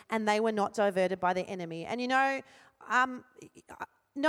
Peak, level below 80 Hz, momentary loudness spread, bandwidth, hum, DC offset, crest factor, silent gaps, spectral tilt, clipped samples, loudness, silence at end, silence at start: -14 dBFS; -74 dBFS; 17 LU; 16 kHz; none; under 0.1%; 18 dB; none; -4.5 dB/octave; under 0.1%; -30 LUFS; 0 s; 0.1 s